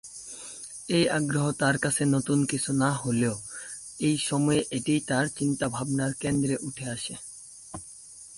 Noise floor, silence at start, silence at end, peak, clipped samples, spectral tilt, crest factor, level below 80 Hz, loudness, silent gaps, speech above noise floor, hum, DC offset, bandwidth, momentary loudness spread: -47 dBFS; 0.05 s; 0 s; -10 dBFS; under 0.1%; -4.5 dB/octave; 16 dB; -58 dBFS; -27 LUFS; none; 21 dB; none; under 0.1%; 11.5 kHz; 16 LU